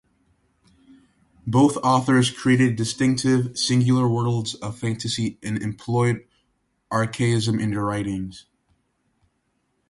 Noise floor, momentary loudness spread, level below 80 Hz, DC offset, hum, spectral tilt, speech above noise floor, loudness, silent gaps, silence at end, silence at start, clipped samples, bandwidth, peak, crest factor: -71 dBFS; 10 LU; -54 dBFS; under 0.1%; none; -5.5 dB/octave; 50 dB; -22 LUFS; none; 1.5 s; 1.45 s; under 0.1%; 11.5 kHz; -6 dBFS; 18 dB